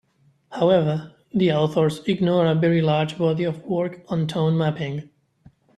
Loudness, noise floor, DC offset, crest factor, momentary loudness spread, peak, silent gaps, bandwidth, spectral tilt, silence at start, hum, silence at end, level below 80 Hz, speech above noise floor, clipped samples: -22 LUFS; -55 dBFS; under 0.1%; 16 dB; 10 LU; -6 dBFS; none; 11 kHz; -8 dB/octave; 0.5 s; none; 0.75 s; -60 dBFS; 34 dB; under 0.1%